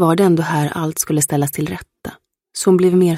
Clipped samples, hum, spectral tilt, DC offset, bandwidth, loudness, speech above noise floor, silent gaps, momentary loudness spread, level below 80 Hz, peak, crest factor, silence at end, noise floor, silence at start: under 0.1%; none; -5.5 dB/octave; under 0.1%; 16.5 kHz; -16 LUFS; 21 dB; none; 19 LU; -52 dBFS; -2 dBFS; 14 dB; 0 s; -36 dBFS; 0 s